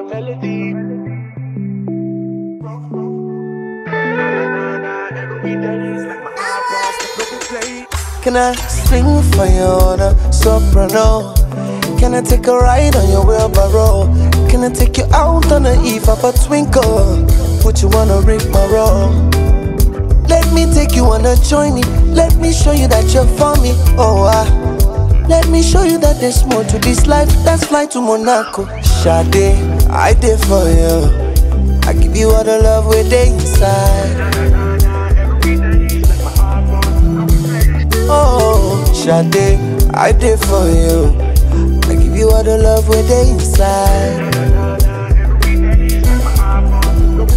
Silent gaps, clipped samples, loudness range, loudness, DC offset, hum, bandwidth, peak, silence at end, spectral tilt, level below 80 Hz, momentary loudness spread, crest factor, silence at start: none; under 0.1%; 8 LU; -12 LUFS; under 0.1%; none; 16 kHz; 0 dBFS; 0 s; -6 dB/octave; -12 dBFS; 11 LU; 10 dB; 0 s